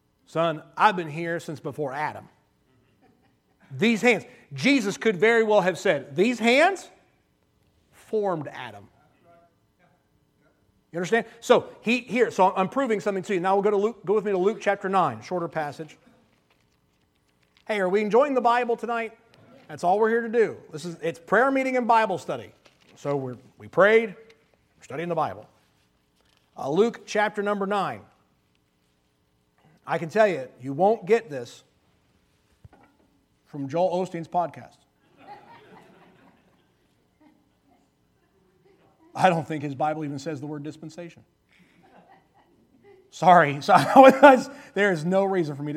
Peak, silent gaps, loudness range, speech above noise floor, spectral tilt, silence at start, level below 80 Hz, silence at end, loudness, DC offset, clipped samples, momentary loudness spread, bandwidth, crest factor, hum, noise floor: 0 dBFS; none; 10 LU; 45 dB; -5.5 dB/octave; 0.35 s; -72 dBFS; 0 s; -23 LUFS; under 0.1%; under 0.1%; 18 LU; 14.5 kHz; 26 dB; none; -68 dBFS